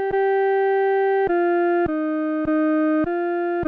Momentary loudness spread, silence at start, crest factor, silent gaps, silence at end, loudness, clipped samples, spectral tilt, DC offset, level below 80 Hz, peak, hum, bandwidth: 4 LU; 0 s; 6 dB; none; 0 s; -20 LUFS; under 0.1%; -9 dB/octave; under 0.1%; -50 dBFS; -14 dBFS; none; 4.6 kHz